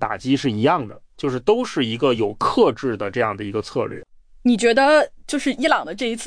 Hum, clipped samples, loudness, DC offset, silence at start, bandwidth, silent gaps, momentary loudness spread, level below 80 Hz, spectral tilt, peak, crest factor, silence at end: none; under 0.1%; -20 LUFS; under 0.1%; 0 s; 10.5 kHz; none; 10 LU; -50 dBFS; -5 dB/octave; -4 dBFS; 16 dB; 0 s